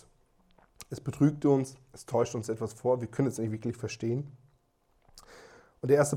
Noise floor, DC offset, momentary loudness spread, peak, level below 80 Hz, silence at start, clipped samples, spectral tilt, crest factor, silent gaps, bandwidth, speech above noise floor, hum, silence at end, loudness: -70 dBFS; under 0.1%; 17 LU; -12 dBFS; -66 dBFS; 0.8 s; under 0.1%; -7 dB/octave; 20 dB; none; 16 kHz; 41 dB; none; 0 s; -31 LUFS